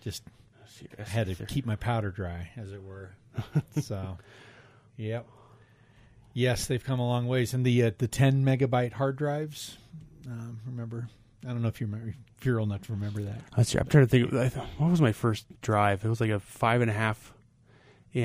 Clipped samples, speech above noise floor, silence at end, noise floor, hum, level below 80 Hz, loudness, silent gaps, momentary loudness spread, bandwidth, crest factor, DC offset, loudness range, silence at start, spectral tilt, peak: under 0.1%; 31 dB; 0 s; -59 dBFS; none; -54 dBFS; -29 LUFS; none; 18 LU; 15.5 kHz; 22 dB; under 0.1%; 11 LU; 0.05 s; -6.5 dB/octave; -8 dBFS